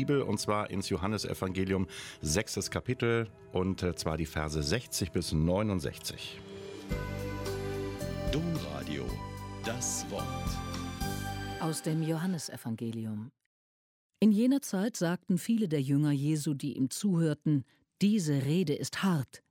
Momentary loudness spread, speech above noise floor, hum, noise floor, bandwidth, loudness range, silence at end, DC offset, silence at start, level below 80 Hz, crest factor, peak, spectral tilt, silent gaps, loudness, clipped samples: 9 LU; over 59 dB; none; under -90 dBFS; 16.5 kHz; 6 LU; 0.15 s; under 0.1%; 0 s; -48 dBFS; 18 dB; -14 dBFS; -5.5 dB/octave; 13.46-14.10 s; -32 LUFS; under 0.1%